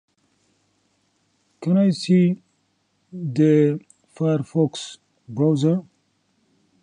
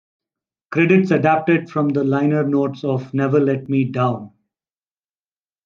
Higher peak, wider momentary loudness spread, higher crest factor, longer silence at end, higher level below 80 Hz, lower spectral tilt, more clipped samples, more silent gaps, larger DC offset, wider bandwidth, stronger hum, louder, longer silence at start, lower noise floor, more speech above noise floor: about the same, -6 dBFS vs -4 dBFS; first, 15 LU vs 7 LU; about the same, 16 dB vs 16 dB; second, 1 s vs 1.4 s; about the same, -70 dBFS vs -66 dBFS; second, -7.5 dB/octave vs -9 dB/octave; neither; neither; neither; first, 10 kHz vs 7.2 kHz; neither; second, -21 LUFS vs -18 LUFS; first, 1.6 s vs 0.7 s; second, -68 dBFS vs under -90 dBFS; second, 49 dB vs over 73 dB